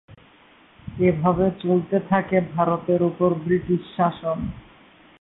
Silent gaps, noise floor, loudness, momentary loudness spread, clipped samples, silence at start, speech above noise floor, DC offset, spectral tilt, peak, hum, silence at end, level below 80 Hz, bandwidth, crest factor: none; -53 dBFS; -22 LUFS; 9 LU; under 0.1%; 0.1 s; 32 dB; under 0.1%; -12.5 dB/octave; -6 dBFS; none; 0.6 s; -48 dBFS; 4 kHz; 18 dB